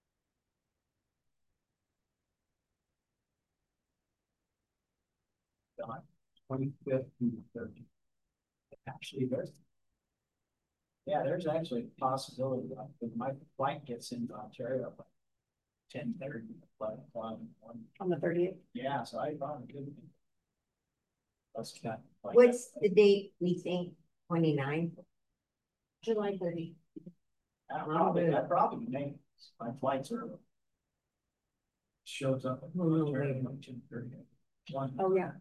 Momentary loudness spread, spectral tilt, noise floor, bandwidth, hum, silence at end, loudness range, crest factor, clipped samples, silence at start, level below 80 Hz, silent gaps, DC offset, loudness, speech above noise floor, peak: 18 LU; -7 dB/octave; -89 dBFS; 12.5 kHz; none; 0 s; 13 LU; 24 dB; under 0.1%; 5.8 s; -78 dBFS; none; under 0.1%; -34 LUFS; 55 dB; -12 dBFS